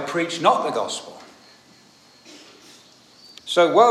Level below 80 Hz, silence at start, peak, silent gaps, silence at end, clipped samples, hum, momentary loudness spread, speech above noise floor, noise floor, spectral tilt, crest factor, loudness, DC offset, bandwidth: -78 dBFS; 0 s; -2 dBFS; none; 0 s; under 0.1%; none; 27 LU; 34 dB; -52 dBFS; -3.5 dB/octave; 20 dB; -20 LUFS; under 0.1%; 13.5 kHz